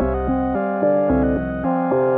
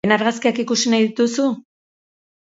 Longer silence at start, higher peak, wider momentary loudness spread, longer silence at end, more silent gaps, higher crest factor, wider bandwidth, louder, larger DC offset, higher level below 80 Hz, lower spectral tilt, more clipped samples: about the same, 0 s vs 0.05 s; second, -6 dBFS vs 0 dBFS; about the same, 4 LU vs 5 LU; second, 0 s vs 0.95 s; neither; second, 12 dB vs 20 dB; second, 3.7 kHz vs 8 kHz; about the same, -20 LUFS vs -18 LUFS; neither; first, -32 dBFS vs -62 dBFS; first, -12.5 dB/octave vs -3.5 dB/octave; neither